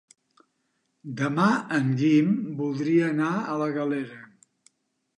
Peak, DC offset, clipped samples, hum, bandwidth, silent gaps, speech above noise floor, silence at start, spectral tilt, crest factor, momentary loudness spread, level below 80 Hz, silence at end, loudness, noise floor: -8 dBFS; under 0.1%; under 0.1%; none; 10.5 kHz; none; 51 dB; 1.05 s; -7 dB/octave; 18 dB; 10 LU; -76 dBFS; 0.9 s; -25 LUFS; -75 dBFS